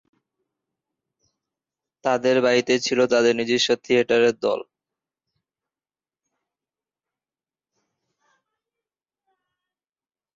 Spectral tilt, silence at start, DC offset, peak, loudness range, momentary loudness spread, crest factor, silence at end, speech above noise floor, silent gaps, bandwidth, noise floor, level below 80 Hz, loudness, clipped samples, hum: -3.5 dB/octave; 2.05 s; under 0.1%; -6 dBFS; 7 LU; 7 LU; 20 dB; 5.75 s; over 70 dB; none; 7.8 kHz; under -90 dBFS; -68 dBFS; -20 LUFS; under 0.1%; none